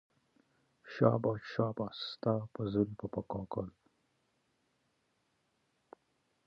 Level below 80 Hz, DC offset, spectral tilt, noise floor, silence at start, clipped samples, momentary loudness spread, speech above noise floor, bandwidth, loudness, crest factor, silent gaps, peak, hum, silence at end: -66 dBFS; under 0.1%; -8.5 dB/octave; -78 dBFS; 0.85 s; under 0.1%; 12 LU; 44 dB; 6.6 kHz; -35 LUFS; 24 dB; none; -14 dBFS; none; 2.8 s